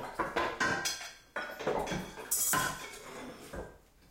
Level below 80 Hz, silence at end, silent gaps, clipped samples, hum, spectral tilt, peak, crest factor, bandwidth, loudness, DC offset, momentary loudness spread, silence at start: -56 dBFS; 0.05 s; none; under 0.1%; none; -2 dB/octave; -16 dBFS; 20 dB; 16.5 kHz; -34 LUFS; under 0.1%; 17 LU; 0 s